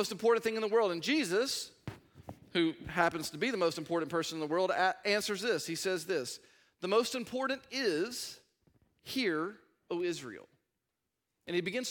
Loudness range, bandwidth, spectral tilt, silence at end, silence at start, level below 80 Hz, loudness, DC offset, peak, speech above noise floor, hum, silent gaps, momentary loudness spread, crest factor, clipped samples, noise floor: 6 LU; 17.5 kHz; -3.5 dB/octave; 0 s; 0 s; -72 dBFS; -33 LUFS; under 0.1%; -12 dBFS; 53 dB; none; none; 14 LU; 22 dB; under 0.1%; -86 dBFS